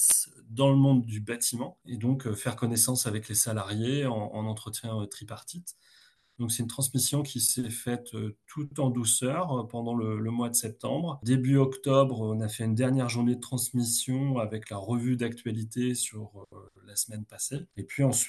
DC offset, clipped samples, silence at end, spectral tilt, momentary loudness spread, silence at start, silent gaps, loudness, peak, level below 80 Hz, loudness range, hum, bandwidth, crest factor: under 0.1%; under 0.1%; 0 s; -4.5 dB/octave; 13 LU; 0 s; none; -28 LUFS; -8 dBFS; -68 dBFS; 5 LU; none; 12.5 kHz; 22 dB